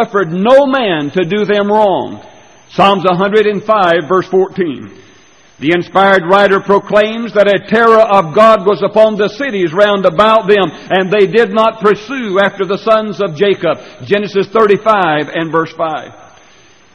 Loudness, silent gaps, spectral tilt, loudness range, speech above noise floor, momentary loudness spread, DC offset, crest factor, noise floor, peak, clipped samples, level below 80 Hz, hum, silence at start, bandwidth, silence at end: -11 LUFS; none; -6 dB/octave; 4 LU; 34 dB; 8 LU; 0.2%; 12 dB; -44 dBFS; 0 dBFS; 0.2%; -52 dBFS; none; 0 s; 9.4 kHz; 0.8 s